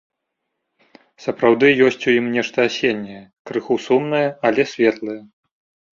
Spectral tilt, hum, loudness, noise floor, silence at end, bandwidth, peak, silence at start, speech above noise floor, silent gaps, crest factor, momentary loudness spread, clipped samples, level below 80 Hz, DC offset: -5.5 dB/octave; none; -18 LUFS; -77 dBFS; 0.7 s; 7.4 kHz; -2 dBFS; 1.2 s; 59 dB; 3.39-3.45 s; 18 dB; 15 LU; under 0.1%; -62 dBFS; under 0.1%